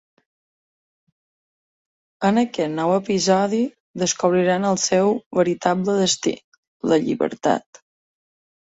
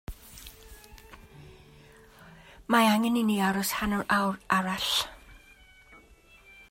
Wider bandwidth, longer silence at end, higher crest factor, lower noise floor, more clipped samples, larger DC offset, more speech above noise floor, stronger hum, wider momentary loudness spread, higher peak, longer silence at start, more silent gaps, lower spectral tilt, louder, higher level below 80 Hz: second, 8 kHz vs 16 kHz; first, 1.05 s vs 0.75 s; about the same, 20 dB vs 22 dB; first, under -90 dBFS vs -56 dBFS; neither; neither; first, over 70 dB vs 30 dB; neither; second, 6 LU vs 23 LU; first, -2 dBFS vs -8 dBFS; first, 2.2 s vs 0.1 s; first, 3.80-3.94 s, 5.26-5.31 s, 6.44-6.80 s vs none; about the same, -4.5 dB/octave vs -4 dB/octave; first, -20 LUFS vs -26 LUFS; second, -64 dBFS vs -52 dBFS